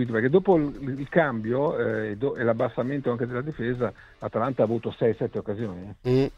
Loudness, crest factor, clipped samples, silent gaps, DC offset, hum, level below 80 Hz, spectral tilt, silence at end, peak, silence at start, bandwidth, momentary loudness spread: -26 LUFS; 20 dB; under 0.1%; none; under 0.1%; none; -52 dBFS; -9 dB/octave; 0.05 s; -6 dBFS; 0 s; 7.2 kHz; 10 LU